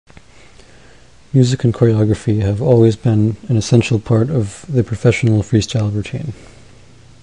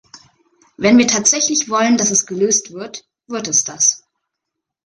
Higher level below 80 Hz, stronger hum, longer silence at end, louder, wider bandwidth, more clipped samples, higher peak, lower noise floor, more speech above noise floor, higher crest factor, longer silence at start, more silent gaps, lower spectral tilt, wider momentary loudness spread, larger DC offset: first, -38 dBFS vs -58 dBFS; neither; about the same, 0.9 s vs 0.9 s; about the same, -15 LUFS vs -14 LUFS; about the same, 10.5 kHz vs 10.5 kHz; neither; about the same, 0 dBFS vs 0 dBFS; second, -45 dBFS vs -80 dBFS; second, 31 dB vs 64 dB; about the same, 16 dB vs 18 dB; first, 1.35 s vs 0.8 s; neither; first, -7 dB/octave vs -2 dB/octave; second, 7 LU vs 18 LU; first, 0.5% vs under 0.1%